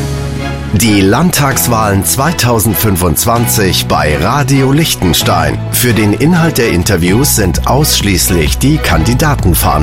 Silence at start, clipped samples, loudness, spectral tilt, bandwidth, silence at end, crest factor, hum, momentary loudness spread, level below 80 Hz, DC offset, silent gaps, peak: 0 s; under 0.1%; -10 LUFS; -4.5 dB/octave; 17 kHz; 0 s; 10 dB; none; 2 LU; -22 dBFS; 0.8%; none; 0 dBFS